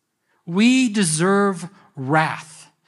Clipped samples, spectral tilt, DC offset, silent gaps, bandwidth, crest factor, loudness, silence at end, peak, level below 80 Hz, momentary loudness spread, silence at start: under 0.1%; -4.5 dB/octave; under 0.1%; none; 12 kHz; 16 dB; -18 LUFS; 0.45 s; -4 dBFS; -74 dBFS; 17 LU; 0.45 s